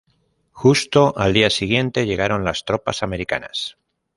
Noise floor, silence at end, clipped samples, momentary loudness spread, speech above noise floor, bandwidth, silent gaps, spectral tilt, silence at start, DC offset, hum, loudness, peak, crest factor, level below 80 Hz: -64 dBFS; 0.45 s; under 0.1%; 9 LU; 46 dB; 11.5 kHz; none; -5 dB/octave; 0.55 s; under 0.1%; none; -19 LUFS; 0 dBFS; 18 dB; -44 dBFS